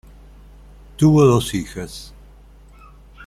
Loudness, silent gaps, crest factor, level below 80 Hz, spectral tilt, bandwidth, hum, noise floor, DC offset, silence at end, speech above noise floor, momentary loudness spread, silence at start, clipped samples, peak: -16 LUFS; none; 18 dB; -42 dBFS; -7 dB/octave; 14.5 kHz; 50 Hz at -35 dBFS; -45 dBFS; under 0.1%; 0 s; 29 dB; 20 LU; 1 s; under 0.1%; -4 dBFS